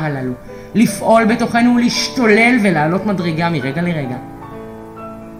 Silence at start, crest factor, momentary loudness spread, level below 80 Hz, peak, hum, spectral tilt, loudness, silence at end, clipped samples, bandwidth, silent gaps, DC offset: 0 s; 14 dB; 20 LU; -46 dBFS; 0 dBFS; none; -5.5 dB/octave; -14 LUFS; 0 s; under 0.1%; 15 kHz; none; under 0.1%